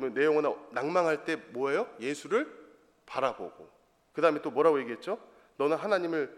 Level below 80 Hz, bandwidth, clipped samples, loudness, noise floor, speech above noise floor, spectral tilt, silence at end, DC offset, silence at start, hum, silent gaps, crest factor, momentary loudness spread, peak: -76 dBFS; 12 kHz; under 0.1%; -30 LUFS; -57 dBFS; 28 dB; -5 dB/octave; 0 s; under 0.1%; 0 s; none; none; 20 dB; 12 LU; -10 dBFS